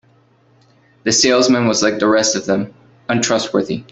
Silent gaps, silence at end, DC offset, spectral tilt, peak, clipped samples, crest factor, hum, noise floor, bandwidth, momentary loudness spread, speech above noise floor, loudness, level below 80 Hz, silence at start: none; 0.1 s; under 0.1%; -3 dB/octave; -2 dBFS; under 0.1%; 16 dB; none; -53 dBFS; 8.4 kHz; 10 LU; 38 dB; -15 LUFS; -54 dBFS; 1.05 s